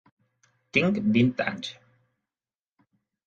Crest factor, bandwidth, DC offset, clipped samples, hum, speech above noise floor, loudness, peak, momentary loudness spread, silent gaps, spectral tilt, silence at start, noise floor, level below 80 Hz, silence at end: 22 dB; 7.6 kHz; under 0.1%; under 0.1%; none; over 66 dB; -25 LUFS; -8 dBFS; 13 LU; none; -6.5 dB/octave; 0.75 s; under -90 dBFS; -64 dBFS; 1.55 s